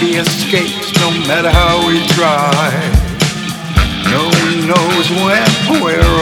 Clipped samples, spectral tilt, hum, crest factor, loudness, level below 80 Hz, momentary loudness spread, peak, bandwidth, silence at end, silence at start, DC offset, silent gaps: 0.4%; -4.5 dB/octave; none; 12 dB; -12 LUFS; -22 dBFS; 4 LU; 0 dBFS; 18.5 kHz; 0 s; 0 s; under 0.1%; none